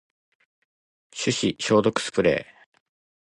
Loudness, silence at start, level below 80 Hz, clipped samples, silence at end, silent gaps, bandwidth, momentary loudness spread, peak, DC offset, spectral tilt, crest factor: -23 LUFS; 1.15 s; -58 dBFS; under 0.1%; 0.85 s; none; 11 kHz; 8 LU; -6 dBFS; under 0.1%; -4.5 dB/octave; 20 dB